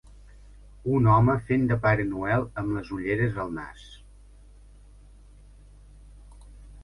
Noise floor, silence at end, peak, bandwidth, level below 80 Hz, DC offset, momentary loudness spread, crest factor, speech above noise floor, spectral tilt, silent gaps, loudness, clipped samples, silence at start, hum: -50 dBFS; 0 s; -8 dBFS; 10.5 kHz; -46 dBFS; under 0.1%; 15 LU; 20 dB; 26 dB; -9 dB/octave; none; -25 LUFS; under 0.1%; 0.35 s; 50 Hz at -45 dBFS